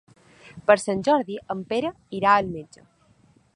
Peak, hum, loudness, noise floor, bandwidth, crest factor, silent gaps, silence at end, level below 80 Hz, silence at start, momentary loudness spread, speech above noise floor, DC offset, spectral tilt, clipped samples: -2 dBFS; none; -23 LUFS; -59 dBFS; 11 kHz; 24 dB; none; 0.9 s; -60 dBFS; 0.45 s; 12 LU; 36 dB; under 0.1%; -5 dB/octave; under 0.1%